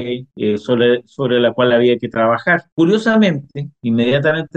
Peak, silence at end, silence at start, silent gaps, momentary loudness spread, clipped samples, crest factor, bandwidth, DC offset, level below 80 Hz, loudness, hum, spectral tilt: -4 dBFS; 0.1 s; 0 s; 2.72-2.77 s; 8 LU; under 0.1%; 12 dB; 8.6 kHz; under 0.1%; -58 dBFS; -15 LUFS; none; -7 dB/octave